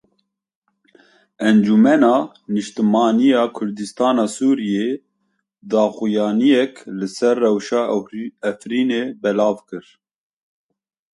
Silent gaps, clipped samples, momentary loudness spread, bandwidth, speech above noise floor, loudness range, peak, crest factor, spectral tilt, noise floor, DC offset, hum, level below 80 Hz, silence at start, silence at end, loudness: none; under 0.1%; 12 LU; 11.5 kHz; 54 dB; 4 LU; -2 dBFS; 18 dB; -6 dB/octave; -71 dBFS; under 0.1%; none; -66 dBFS; 1.4 s; 1.35 s; -18 LUFS